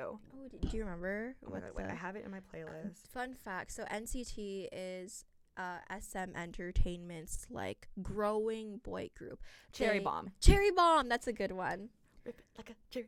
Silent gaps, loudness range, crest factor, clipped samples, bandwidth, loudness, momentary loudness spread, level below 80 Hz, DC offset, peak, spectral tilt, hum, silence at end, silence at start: none; 11 LU; 28 dB; under 0.1%; 15.5 kHz; -37 LUFS; 21 LU; -42 dBFS; under 0.1%; -8 dBFS; -5 dB/octave; none; 0 s; 0 s